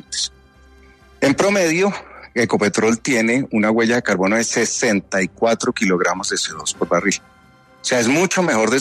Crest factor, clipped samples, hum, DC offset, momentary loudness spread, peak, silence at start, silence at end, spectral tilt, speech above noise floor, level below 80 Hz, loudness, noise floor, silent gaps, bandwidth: 16 dB; under 0.1%; none; under 0.1%; 7 LU; -4 dBFS; 0.1 s; 0 s; -3.5 dB/octave; 32 dB; -54 dBFS; -18 LUFS; -50 dBFS; none; 13.5 kHz